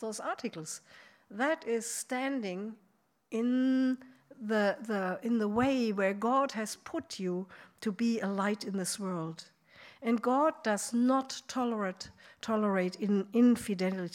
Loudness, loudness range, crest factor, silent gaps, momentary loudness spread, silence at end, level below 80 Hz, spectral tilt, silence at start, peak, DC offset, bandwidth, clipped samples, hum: -32 LUFS; 4 LU; 16 dB; none; 12 LU; 0 s; -74 dBFS; -5 dB/octave; 0 s; -16 dBFS; under 0.1%; 15.5 kHz; under 0.1%; none